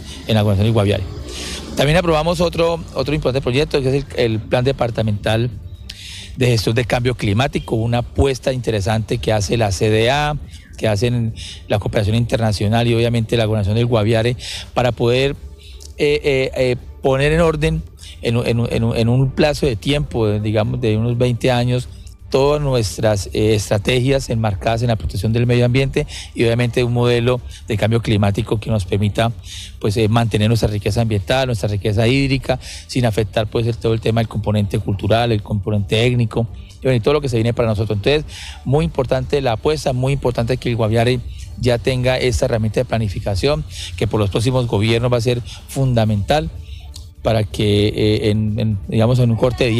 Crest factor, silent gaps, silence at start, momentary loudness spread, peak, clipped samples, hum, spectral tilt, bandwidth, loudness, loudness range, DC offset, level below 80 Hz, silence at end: 12 dB; none; 0 s; 8 LU; -4 dBFS; under 0.1%; none; -6.5 dB/octave; 13.5 kHz; -18 LUFS; 1 LU; under 0.1%; -32 dBFS; 0 s